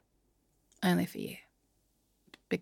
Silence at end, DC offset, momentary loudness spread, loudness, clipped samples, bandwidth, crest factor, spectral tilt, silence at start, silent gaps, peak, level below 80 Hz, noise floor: 0 s; under 0.1%; 14 LU; -34 LUFS; under 0.1%; 17 kHz; 20 dB; -6 dB/octave; 0.8 s; none; -18 dBFS; -74 dBFS; -74 dBFS